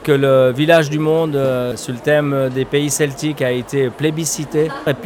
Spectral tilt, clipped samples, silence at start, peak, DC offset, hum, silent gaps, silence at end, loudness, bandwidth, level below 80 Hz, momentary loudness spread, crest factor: -5 dB/octave; under 0.1%; 0 s; -2 dBFS; under 0.1%; none; none; 0 s; -16 LUFS; 17.5 kHz; -50 dBFS; 7 LU; 14 dB